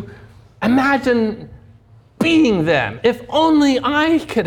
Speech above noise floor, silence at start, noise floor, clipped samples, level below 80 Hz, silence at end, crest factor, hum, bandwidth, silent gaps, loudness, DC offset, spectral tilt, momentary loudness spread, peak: 32 dB; 0 s; -47 dBFS; under 0.1%; -46 dBFS; 0 s; 14 dB; none; 14.5 kHz; none; -16 LUFS; under 0.1%; -5.5 dB/octave; 9 LU; -4 dBFS